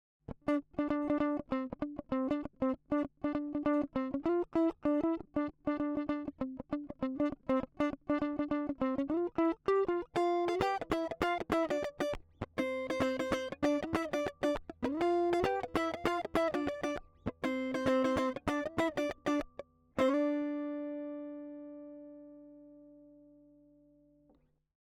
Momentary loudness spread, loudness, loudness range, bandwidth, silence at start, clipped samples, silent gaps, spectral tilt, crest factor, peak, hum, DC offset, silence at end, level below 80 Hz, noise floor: 10 LU; -35 LUFS; 4 LU; 14 kHz; 0.3 s; under 0.1%; none; -6 dB/octave; 20 dB; -16 dBFS; 50 Hz at -75 dBFS; under 0.1%; 1.95 s; -60 dBFS; -70 dBFS